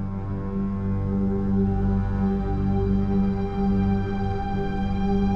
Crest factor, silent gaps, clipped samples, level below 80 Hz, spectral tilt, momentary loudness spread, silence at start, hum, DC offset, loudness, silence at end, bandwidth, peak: 12 dB; none; under 0.1%; -30 dBFS; -10 dB/octave; 4 LU; 0 s; none; under 0.1%; -25 LUFS; 0 s; 5.8 kHz; -12 dBFS